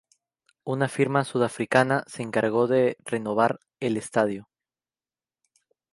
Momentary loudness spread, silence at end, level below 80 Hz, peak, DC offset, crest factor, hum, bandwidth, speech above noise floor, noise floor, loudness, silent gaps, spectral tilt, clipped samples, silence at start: 9 LU; 1.5 s; -70 dBFS; -4 dBFS; under 0.1%; 22 dB; none; 11.5 kHz; over 66 dB; under -90 dBFS; -25 LUFS; none; -6 dB/octave; under 0.1%; 0.65 s